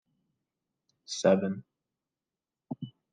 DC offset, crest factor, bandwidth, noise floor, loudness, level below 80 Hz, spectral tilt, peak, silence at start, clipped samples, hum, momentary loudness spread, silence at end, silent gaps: under 0.1%; 24 dB; 9.4 kHz; under -90 dBFS; -28 LUFS; -82 dBFS; -5.5 dB/octave; -10 dBFS; 1.1 s; under 0.1%; none; 16 LU; 0.25 s; none